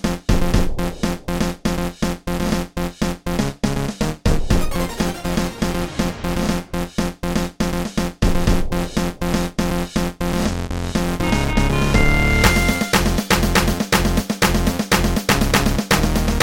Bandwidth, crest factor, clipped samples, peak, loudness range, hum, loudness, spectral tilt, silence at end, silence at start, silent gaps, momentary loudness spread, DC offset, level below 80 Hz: 17 kHz; 18 dB; under 0.1%; 0 dBFS; 6 LU; none; -20 LUFS; -5 dB/octave; 0 s; 0 s; none; 7 LU; 1%; -24 dBFS